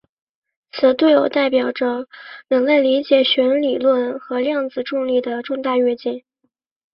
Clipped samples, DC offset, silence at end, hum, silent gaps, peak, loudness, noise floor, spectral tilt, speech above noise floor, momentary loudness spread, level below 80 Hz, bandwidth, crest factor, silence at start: under 0.1%; under 0.1%; 0.75 s; none; none; -2 dBFS; -18 LUFS; -70 dBFS; -6.5 dB/octave; 53 dB; 11 LU; -66 dBFS; 5.8 kHz; 16 dB; 0.75 s